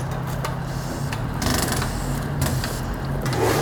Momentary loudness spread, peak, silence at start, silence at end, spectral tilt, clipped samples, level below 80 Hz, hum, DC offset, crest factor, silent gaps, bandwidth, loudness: 6 LU; -6 dBFS; 0 s; 0 s; -5 dB/octave; under 0.1%; -34 dBFS; none; under 0.1%; 18 dB; none; over 20 kHz; -25 LUFS